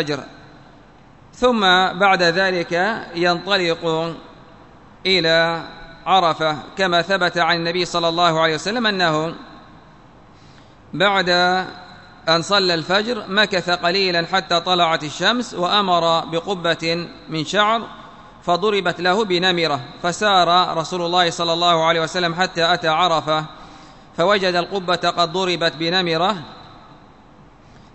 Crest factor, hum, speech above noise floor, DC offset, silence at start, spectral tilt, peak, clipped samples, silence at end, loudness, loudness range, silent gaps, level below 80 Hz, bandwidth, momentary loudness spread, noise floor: 18 dB; none; 28 dB; 0.2%; 0 s; -4 dB/octave; -2 dBFS; under 0.1%; 1.15 s; -18 LUFS; 3 LU; none; -54 dBFS; 8.4 kHz; 9 LU; -47 dBFS